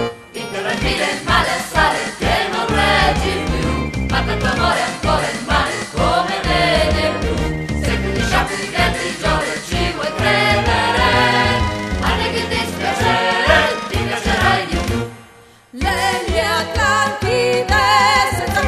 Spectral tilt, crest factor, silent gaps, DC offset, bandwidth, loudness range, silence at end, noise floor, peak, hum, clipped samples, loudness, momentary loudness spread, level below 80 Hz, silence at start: -4 dB/octave; 16 dB; none; under 0.1%; 14 kHz; 2 LU; 0 s; -45 dBFS; 0 dBFS; none; under 0.1%; -16 LUFS; 7 LU; -28 dBFS; 0 s